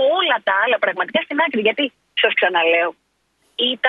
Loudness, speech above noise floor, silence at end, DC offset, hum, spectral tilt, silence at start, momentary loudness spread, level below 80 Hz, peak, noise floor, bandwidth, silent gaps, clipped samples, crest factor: -18 LUFS; 46 dB; 0 s; under 0.1%; none; -5 dB/octave; 0 s; 6 LU; -72 dBFS; 0 dBFS; -64 dBFS; 5 kHz; none; under 0.1%; 18 dB